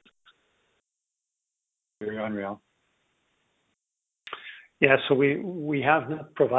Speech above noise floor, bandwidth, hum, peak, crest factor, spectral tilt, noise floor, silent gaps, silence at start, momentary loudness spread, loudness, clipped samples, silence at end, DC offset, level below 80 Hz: 61 dB; 4 kHz; none; -2 dBFS; 28 dB; -8.5 dB/octave; -85 dBFS; none; 2 s; 19 LU; -25 LUFS; under 0.1%; 0 s; under 0.1%; -68 dBFS